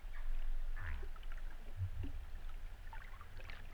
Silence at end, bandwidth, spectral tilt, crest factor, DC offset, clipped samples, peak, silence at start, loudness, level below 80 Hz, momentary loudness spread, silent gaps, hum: 0 s; 5 kHz; -6 dB/octave; 12 dB; under 0.1%; under 0.1%; -30 dBFS; 0 s; -50 LUFS; -42 dBFS; 8 LU; none; none